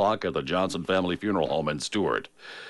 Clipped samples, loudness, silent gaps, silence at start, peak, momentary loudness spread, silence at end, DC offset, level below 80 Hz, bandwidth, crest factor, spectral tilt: under 0.1%; -27 LUFS; none; 0 s; -12 dBFS; 3 LU; 0 s; under 0.1%; -56 dBFS; 11.5 kHz; 16 dB; -5 dB/octave